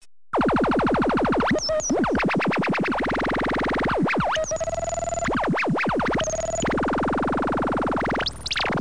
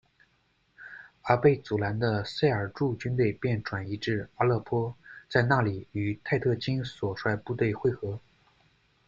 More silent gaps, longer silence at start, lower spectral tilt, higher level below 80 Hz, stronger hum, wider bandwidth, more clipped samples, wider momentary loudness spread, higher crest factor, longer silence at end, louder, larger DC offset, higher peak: neither; second, 0 s vs 0.8 s; second, -4.5 dB/octave vs -8 dB/octave; first, -42 dBFS vs -58 dBFS; neither; first, 10.5 kHz vs 7.6 kHz; neither; second, 4 LU vs 12 LU; second, 14 dB vs 22 dB; second, 0 s vs 0.9 s; first, -23 LUFS vs -29 LUFS; first, 0.8% vs under 0.1%; second, -10 dBFS vs -6 dBFS